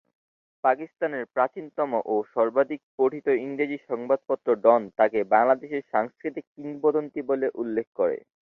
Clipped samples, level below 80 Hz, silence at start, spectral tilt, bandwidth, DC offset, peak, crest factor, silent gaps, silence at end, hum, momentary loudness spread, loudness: under 0.1%; -74 dBFS; 0.65 s; -8.5 dB/octave; 4.3 kHz; under 0.1%; -6 dBFS; 20 dB; 2.83-2.98 s, 6.47-6.55 s, 7.87-7.93 s; 0.35 s; none; 9 LU; -25 LUFS